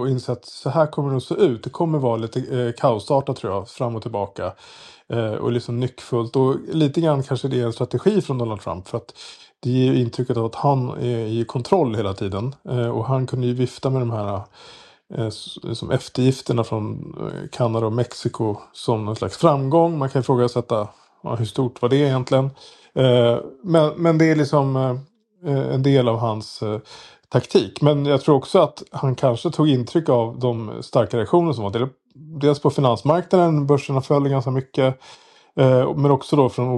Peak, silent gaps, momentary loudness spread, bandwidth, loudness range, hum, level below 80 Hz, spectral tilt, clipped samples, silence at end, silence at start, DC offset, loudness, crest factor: -2 dBFS; none; 11 LU; 11 kHz; 5 LU; none; -60 dBFS; -7.5 dB/octave; under 0.1%; 0 s; 0 s; under 0.1%; -21 LUFS; 18 dB